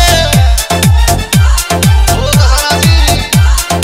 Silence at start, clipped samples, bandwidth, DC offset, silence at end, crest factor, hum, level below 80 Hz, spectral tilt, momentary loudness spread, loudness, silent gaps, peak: 0 s; 0.1%; 16.5 kHz; under 0.1%; 0 s; 8 dB; none; -12 dBFS; -4 dB/octave; 2 LU; -9 LUFS; none; 0 dBFS